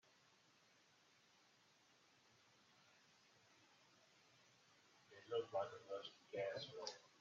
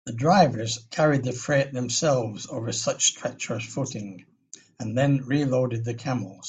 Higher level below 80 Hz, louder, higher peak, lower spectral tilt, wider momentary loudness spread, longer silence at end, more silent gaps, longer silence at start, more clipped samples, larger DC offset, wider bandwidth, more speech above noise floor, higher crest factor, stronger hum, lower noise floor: second, under -90 dBFS vs -60 dBFS; second, -49 LUFS vs -25 LUFS; second, -30 dBFS vs -6 dBFS; second, -2 dB/octave vs -4.5 dB/octave; second, 8 LU vs 11 LU; first, 0.15 s vs 0 s; neither; first, 2.85 s vs 0.05 s; neither; neither; second, 7.4 kHz vs 9.4 kHz; about the same, 28 dB vs 26 dB; about the same, 24 dB vs 20 dB; neither; first, -75 dBFS vs -51 dBFS